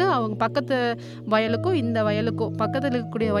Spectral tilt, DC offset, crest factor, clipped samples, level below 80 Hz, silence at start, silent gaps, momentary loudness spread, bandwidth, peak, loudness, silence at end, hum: -7.5 dB/octave; under 0.1%; 16 dB; under 0.1%; -60 dBFS; 0 s; none; 4 LU; 12 kHz; -8 dBFS; -24 LUFS; 0 s; none